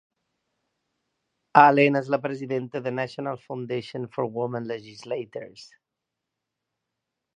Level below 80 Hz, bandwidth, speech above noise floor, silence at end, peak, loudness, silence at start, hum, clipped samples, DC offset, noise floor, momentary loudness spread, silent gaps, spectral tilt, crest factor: -78 dBFS; 9.8 kHz; 60 dB; 1.75 s; 0 dBFS; -24 LUFS; 1.55 s; none; under 0.1%; under 0.1%; -85 dBFS; 18 LU; none; -7 dB/octave; 26 dB